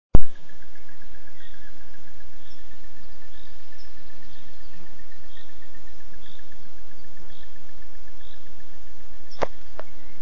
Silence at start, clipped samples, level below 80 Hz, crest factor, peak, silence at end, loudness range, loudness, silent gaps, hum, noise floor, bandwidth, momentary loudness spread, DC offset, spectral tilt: 0.1 s; 0.2%; -38 dBFS; 20 dB; 0 dBFS; 0.75 s; 10 LU; -40 LUFS; none; none; -48 dBFS; 7.2 kHz; 20 LU; 20%; -7 dB/octave